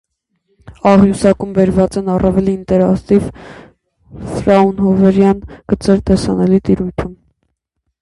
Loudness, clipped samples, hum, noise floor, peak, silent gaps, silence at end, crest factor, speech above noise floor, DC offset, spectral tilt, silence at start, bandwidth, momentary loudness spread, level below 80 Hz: -13 LUFS; under 0.1%; none; -71 dBFS; 0 dBFS; none; 0.85 s; 14 dB; 58 dB; under 0.1%; -8 dB/octave; 0.7 s; 11.5 kHz; 11 LU; -34 dBFS